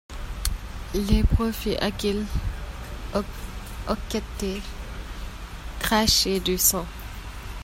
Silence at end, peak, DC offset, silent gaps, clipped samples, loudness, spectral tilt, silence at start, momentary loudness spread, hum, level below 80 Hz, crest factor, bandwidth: 0 s; -4 dBFS; under 0.1%; none; under 0.1%; -25 LUFS; -3.5 dB/octave; 0.1 s; 18 LU; none; -32 dBFS; 22 dB; 16 kHz